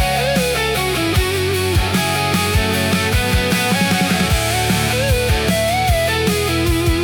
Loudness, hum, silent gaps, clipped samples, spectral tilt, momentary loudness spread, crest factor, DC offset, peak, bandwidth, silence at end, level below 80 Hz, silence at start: -16 LUFS; none; none; under 0.1%; -4 dB/octave; 1 LU; 14 dB; under 0.1%; -4 dBFS; 19 kHz; 0 s; -26 dBFS; 0 s